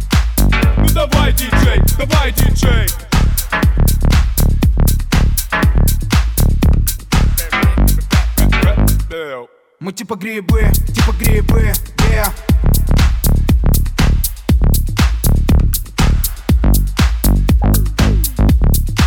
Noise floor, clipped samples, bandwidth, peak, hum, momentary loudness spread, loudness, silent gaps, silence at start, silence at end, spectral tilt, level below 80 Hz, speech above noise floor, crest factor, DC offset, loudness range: -32 dBFS; under 0.1%; 17.5 kHz; 0 dBFS; none; 3 LU; -14 LUFS; none; 0 s; 0 s; -5 dB/octave; -14 dBFS; 20 dB; 12 dB; under 0.1%; 2 LU